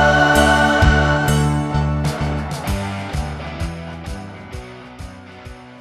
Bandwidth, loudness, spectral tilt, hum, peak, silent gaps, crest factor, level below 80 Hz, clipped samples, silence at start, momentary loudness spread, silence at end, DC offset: 15.5 kHz; -17 LUFS; -5.5 dB/octave; none; 0 dBFS; none; 18 dB; -26 dBFS; under 0.1%; 0 s; 23 LU; 0 s; under 0.1%